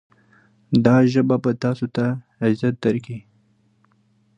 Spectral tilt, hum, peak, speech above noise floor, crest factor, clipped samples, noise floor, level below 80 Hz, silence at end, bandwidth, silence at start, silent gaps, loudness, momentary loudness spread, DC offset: -8.5 dB/octave; none; -2 dBFS; 42 dB; 20 dB; under 0.1%; -61 dBFS; -60 dBFS; 1.2 s; 7.8 kHz; 0.7 s; none; -20 LUFS; 10 LU; under 0.1%